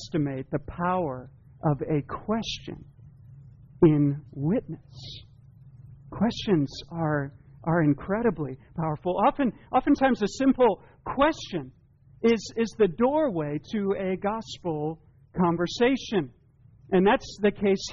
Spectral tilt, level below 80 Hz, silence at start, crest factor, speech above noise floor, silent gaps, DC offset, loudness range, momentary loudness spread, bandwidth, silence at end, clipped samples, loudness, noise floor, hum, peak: -6 dB/octave; -52 dBFS; 0 s; 18 dB; 30 dB; none; under 0.1%; 5 LU; 13 LU; 7.2 kHz; 0 s; under 0.1%; -26 LUFS; -56 dBFS; none; -8 dBFS